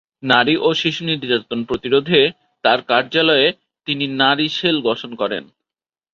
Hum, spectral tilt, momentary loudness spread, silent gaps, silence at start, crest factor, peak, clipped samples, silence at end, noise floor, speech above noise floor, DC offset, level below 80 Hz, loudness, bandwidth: none; -5 dB/octave; 9 LU; none; 0.25 s; 18 dB; 0 dBFS; under 0.1%; 0.7 s; under -90 dBFS; over 73 dB; under 0.1%; -58 dBFS; -17 LUFS; 7.4 kHz